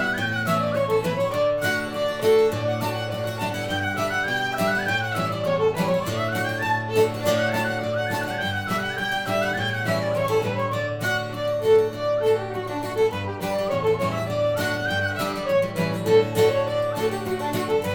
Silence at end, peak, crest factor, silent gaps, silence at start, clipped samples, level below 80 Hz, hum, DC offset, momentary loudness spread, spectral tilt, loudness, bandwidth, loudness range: 0 s; -8 dBFS; 16 dB; none; 0 s; under 0.1%; -52 dBFS; none; under 0.1%; 6 LU; -5 dB/octave; -23 LUFS; 19.5 kHz; 2 LU